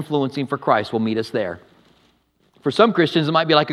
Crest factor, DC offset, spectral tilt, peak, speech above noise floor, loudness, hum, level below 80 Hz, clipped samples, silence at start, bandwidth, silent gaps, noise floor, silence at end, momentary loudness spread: 20 dB; under 0.1%; -6.5 dB/octave; 0 dBFS; 43 dB; -19 LUFS; none; -66 dBFS; under 0.1%; 0 s; 12.5 kHz; none; -61 dBFS; 0 s; 10 LU